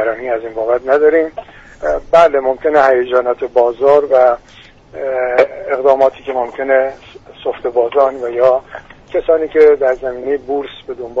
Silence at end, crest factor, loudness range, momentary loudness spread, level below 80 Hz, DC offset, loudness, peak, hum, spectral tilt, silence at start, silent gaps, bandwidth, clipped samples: 0 s; 14 dB; 3 LU; 13 LU; -44 dBFS; under 0.1%; -14 LUFS; 0 dBFS; none; -5.5 dB/octave; 0 s; none; 7.6 kHz; under 0.1%